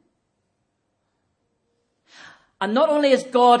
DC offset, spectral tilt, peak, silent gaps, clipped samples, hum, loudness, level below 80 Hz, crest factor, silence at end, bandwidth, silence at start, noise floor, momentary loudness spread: under 0.1%; -4.5 dB/octave; -2 dBFS; none; under 0.1%; none; -19 LUFS; -80 dBFS; 20 dB; 0 s; 10.5 kHz; 2.6 s; -73 dBFS; 8 LU